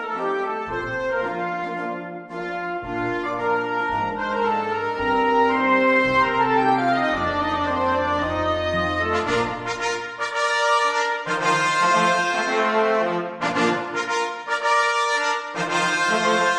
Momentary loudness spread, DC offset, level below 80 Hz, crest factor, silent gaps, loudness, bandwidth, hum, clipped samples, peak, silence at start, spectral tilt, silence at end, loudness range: 8 LU; under 0.1%; -50 dBFS; 14 dB; none; -21 LUFS; 11 kHz; none; under 0.1%; -6 dBFS; 0 s; -4 dB/octave; 0 s; 6 LU